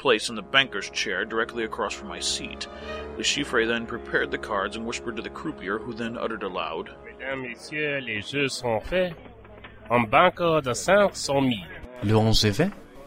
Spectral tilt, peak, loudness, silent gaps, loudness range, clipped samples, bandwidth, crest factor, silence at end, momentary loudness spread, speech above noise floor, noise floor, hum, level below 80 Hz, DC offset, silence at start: -4 dB/octave; -2 dBFS; -25 LUFS; none; 8 LU; under 0.1%; 16 kHz; 24 dB; 0 s; 14 LU; 20 dB; -45 dBFS; none; -44 dBFS; under 0.1%; 0 s